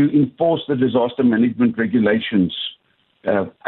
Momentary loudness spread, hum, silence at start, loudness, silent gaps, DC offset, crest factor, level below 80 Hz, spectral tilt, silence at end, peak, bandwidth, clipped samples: 5 LU; none; 0 s; -18 LUFS; none; under 0.1%; 12 dB; -54 dBFS; -10.5 dB/octave; 0 s; -6 dBFS; 4.1 kHz; under 0.1%